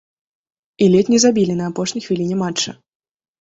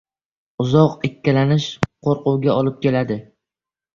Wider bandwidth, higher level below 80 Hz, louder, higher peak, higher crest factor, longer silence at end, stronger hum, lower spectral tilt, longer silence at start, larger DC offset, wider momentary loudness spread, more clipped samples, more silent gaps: first, 8 kHz vs 7.2 kHz; second, -56 dBFS vs -50 dBFS; about the same, -17 LUFS vs -19 LUFS; about the same, -2 dBFS vs 0 dBFS; about the same, 16 dB vs 18 dB; about the same, 0.65 s vs 0.75 s; neither; second, -5 dB/octave vs -7.5 dB/octave; first, 0.8 s vs 0.6 s; neither; about the same, 9 LU vs 9 LU; neither; neither